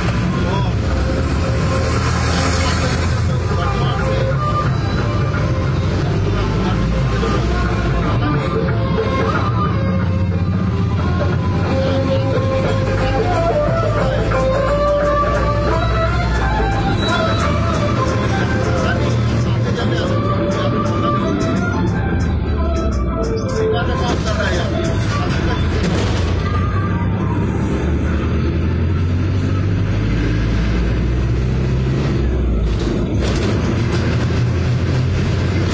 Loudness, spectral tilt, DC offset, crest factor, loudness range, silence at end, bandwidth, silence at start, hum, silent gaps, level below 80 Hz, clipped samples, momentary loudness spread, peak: -17 LUFS; -7 dB/octave; under 0.1%; 12 dB; 2 LU; 0 s; 8 kHz; 0 s; none; none; -22 dBFS; under 0.1%; 2 LU; -4 dBFS